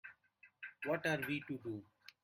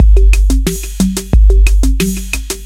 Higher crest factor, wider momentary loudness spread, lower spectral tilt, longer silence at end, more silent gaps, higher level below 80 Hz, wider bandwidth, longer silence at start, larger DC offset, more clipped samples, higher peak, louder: first, 20 dB vs 8 dB; first, 18 LU vs 8 LU; about the same, -5.5 dB/octave vs -5.5 dB/octave; first, 0.4 s vs 0 s; neither; second, -78 dBFS vs -10 dBFS; about the same, 16 kHz vs 15.5 kHz; about the same, 0.05 s vs 0 s; neither; neither; second, -24 dBFS vs 0 dBFS; second, -41 LUFS vs -13 LUFS